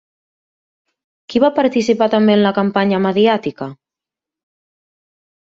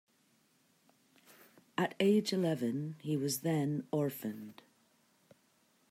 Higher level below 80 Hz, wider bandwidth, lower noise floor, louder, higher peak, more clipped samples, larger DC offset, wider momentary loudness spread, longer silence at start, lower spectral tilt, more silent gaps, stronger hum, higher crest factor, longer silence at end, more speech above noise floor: first, -58 dBFS vs -82 dBFS; second, 7.6 kHz vs 16 kHz; first, -87 dBFS vs -72 dBFS; first, -15 LUFS vs -34 LUFS; first, -2 dBFS vs -18 dBFS; neither; neither; about the same, 11 LU vs 13 LU; second, 1.3 s vs 1.8 s; about the same, -6.5 dB/octave vs -5.5 dB/octave; neither; neither; about the same, 16 dB vs 20 dB; first, 1.65 s vs 1.4 s; first, 73 dB vs 38 dB